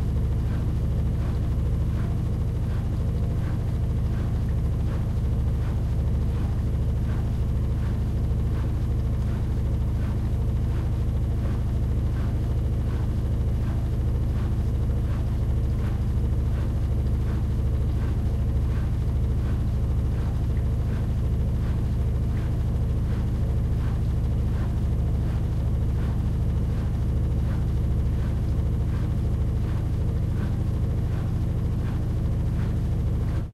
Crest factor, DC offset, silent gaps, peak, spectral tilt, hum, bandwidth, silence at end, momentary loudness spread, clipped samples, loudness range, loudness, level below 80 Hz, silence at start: 10 dB; under 0.1%; none; -14 dBFS; -9 dB/octave; none; 12 kHz; 0 s; 1 LU; under 0.1%; 1 LU; -26 LUFS; -26 dBFS; 0 s